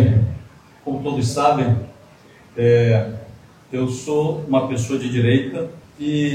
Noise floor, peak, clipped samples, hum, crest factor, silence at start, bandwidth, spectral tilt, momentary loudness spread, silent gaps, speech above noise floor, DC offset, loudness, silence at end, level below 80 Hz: -47 dBFS; -2 dBFS; under 0.1%; none; 16 dB; 0 s; 10.5 kHz; -7 dB/octave; 15 LU; none; 29 dB; under 0.1%; -20 LUFS; 0 s; -50 dBFS